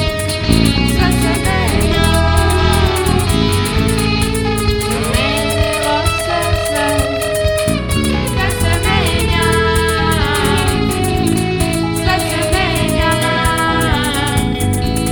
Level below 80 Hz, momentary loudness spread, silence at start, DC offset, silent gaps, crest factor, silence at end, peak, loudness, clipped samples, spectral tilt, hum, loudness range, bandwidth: -22 dBFS; 3 LU; 0 s; under 0.1%; none; 14 dB; 0 s; 0 dBFS; -14 LUFS; under 0.1%; -4.5 dB/octave; none; 2 LU; over 20 kHz